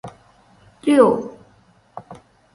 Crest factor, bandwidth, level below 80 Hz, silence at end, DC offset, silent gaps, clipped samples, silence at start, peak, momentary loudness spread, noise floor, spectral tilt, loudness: 22 dB; 11.5 kHz; -60 dBFS; 0.4 s; under 0.1%; none; under 0.1%; 0.05 s; 0 dBFS; 26 LU; -55 dBFS; -6 dB/octave; -17 LUFS